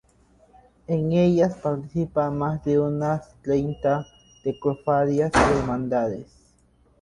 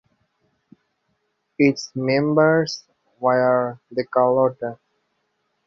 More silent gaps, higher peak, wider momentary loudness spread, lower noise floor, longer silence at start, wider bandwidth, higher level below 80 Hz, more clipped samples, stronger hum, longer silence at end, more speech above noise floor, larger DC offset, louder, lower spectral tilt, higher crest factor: neither; about the same, -6 dBFS vs -4 dBFS; second, 9 LU vs 12 LU; second, -60 dBFS vs -72 dBFS; second, 0.9 s vs 1.6 s; first, 11.5 kHz vs 7.6 kHz; first, -44 dBFS vs -64 dBFS; neither; neither; second, 0.75 s vs 0.95 s; second, 37 dB vs 52 dB; neither; second, -23 LUFS vs -20 LUFS; about the same, -7 dB/octave vs -6 dB/octave; about the same, 18 dB vs 18 dB